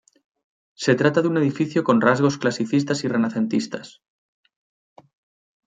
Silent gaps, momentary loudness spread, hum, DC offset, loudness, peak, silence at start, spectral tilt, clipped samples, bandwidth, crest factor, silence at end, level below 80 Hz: none; 7 LU; none; under 0.1%; -21 LUFS; -2 dBFS; 0.8 s; -6 dB/octave; under 0.1%; 9.4 kHz; 20 dB; 1.8 s; -66 dBFS